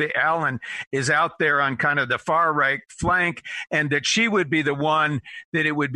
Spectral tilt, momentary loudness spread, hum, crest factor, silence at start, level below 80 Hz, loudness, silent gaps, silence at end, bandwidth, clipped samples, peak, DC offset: -4 dB/octave; 6 LU; none; 14 dB; 0 s; -52 dBFS; -21 LUFS; 0.87-0.91 s, 5.45-5.52 s; 0 s; 11 kHz; under 0.1%; -8 dBFS; under 0.1%